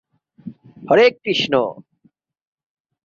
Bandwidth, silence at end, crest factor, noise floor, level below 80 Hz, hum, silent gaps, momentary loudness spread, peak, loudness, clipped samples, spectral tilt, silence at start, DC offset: 7.4 kHz; 1.25 s; 18 dB; -60 dBFS; -64 dBFS; none; none; 25 LU; -2 dBFS; -17 LUFS; under 0.1%; -5 dB/octave; 0.45 s; under 0.1%